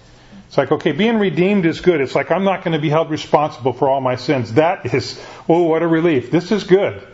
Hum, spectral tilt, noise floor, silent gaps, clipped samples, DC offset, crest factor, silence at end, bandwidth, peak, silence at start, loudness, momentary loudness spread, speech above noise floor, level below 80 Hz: none; -7 dB/octave; -42 dBFS; none; under 0.1%; under 0.1%; 16 dB; 0.1 s; 8 kHz; 0 dBFS; 0.3 s; -17 LUFS; 5 LU; 26 dB; -52 dBFS